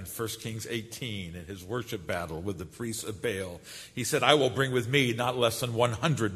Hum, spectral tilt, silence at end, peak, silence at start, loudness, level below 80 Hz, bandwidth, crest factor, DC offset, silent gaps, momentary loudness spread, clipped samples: none; -4.5 dB/octave; 0 s; -4 dBFS; 0 s; -29 LUFS; -58 dBFS; 13.5 kHz; 26 dB; under 0.1%; none; 14 LU; under 0.1%